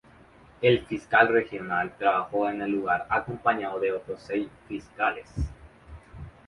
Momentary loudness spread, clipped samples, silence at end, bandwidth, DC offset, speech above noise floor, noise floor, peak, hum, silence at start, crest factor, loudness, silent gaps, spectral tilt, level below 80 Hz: 14 LU; under 0.1%; 0.15 s; 11 kHz; under 0.1%; 27 dB; -54 dBFS; -6 dBFS; none; 0.6 s; 22 dB; -26 LUFS; none; -7 dB/octave; -46 dBFS